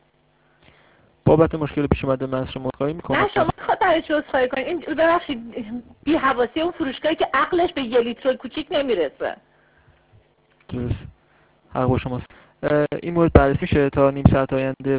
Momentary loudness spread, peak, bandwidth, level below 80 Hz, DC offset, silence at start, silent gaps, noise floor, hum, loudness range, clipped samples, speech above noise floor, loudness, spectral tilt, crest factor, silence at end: 13 LU; 0 dBFS; 4 kHz; -36 dBFS; under 0.1%; 1.25 s; none; -61 dBFS; none; 8 LU; under 0.1%; 40 dB; -21 LUFS; -11 dB/octave; 22 dB; 0 s